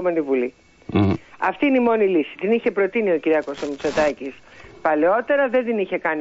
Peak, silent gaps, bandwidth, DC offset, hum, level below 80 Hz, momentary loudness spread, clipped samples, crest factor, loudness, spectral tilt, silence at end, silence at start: -6 dBFS; none; 8 kHz; under 0.1%; none; -54 dBFS; 7 LU; under 0.1%; 14 dB; -21 LUFS; -7 dB/octave; 0 s; 0 s